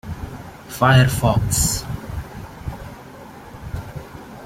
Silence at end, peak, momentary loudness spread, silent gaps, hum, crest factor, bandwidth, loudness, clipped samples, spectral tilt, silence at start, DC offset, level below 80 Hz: 0 s; -2 dBFS; 23 LU; none; none; 20 dB; 16.5 kHz; -18 LUFS; under 0.1%; -4.5 dB/octave; 0.05 s; under 0.1%; -36 dBFS